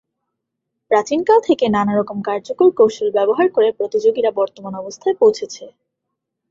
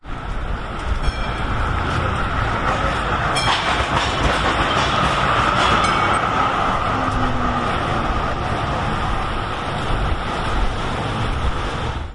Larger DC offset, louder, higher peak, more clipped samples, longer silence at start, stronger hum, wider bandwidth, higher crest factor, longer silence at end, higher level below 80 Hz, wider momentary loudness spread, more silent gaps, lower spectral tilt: neither; first, -16 LUFS vs -20 LUFS; about the same, -2 dBFS vs -4 dBFS; neither; first, 0.9 s vs 0.05 s; neither; second, 7.6 kHz vs 11.5 kHz; about the same, 16 dB vs 16 dB; first, 0.8 s vs 0 s; second, -62 dBFS vs -26 dBFS; first, 10 LU vs 7 LU; neither; about the same, -5.5 dB/octave vs -5 dB/octave